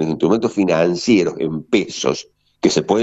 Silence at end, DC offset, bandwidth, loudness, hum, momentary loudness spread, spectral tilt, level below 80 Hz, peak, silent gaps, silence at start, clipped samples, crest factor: 0 s; under 0.1%; 8.2 kHz; -18 LUFS; none; 6 LU; -5 dB/octave; -54 dBFS; -2 dBFS; none; 0 s; under 0.1%; 16 dB